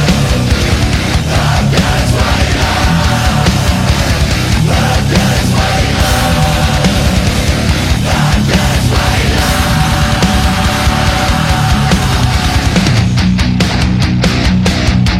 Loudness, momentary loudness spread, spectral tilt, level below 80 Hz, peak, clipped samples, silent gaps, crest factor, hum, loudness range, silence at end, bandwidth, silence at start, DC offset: -11 LUFS; 1 LU; -5 dB/octave; -16 dBFS; 0 dBFS; under 0.1%; none; 10 dB; none; 0 LU; 0 s; 16.5 kHz; 0 s; under 0.1%